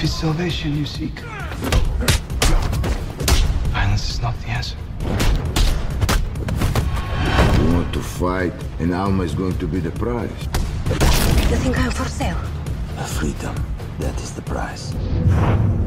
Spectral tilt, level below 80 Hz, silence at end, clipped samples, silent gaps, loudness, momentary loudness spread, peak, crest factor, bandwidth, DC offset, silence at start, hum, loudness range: -5.5 dB/octave; -22 dBFS; 0 s; under 0.1%; none; -21 LUFS; 9 LU; -4 dBFS; 16 dB; 16 kHz; under 0.1%; 0 s; none; 3 LU